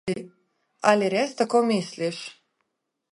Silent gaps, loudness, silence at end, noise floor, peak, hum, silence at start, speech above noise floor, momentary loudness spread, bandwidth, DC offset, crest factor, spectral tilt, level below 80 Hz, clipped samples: none; -24 LUFS; 0.8 s; -80 dBFS; -4 dBFS; none; 0.05 s; 57 dB; 13 LU; 11.5 kHz; under 0.1%; 22 dB; -5 dB/octave; -70 dBFS; under 0.1%